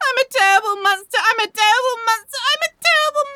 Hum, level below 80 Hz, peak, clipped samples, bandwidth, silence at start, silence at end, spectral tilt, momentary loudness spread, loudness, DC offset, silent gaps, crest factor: none; -70 dBFS; -2 dBFS; under 0.1%; 20 kHz; 0 s; 0 s; 2 dB/octave; 5 LU; -16 LUFS; under 0.1%; none; 16 dB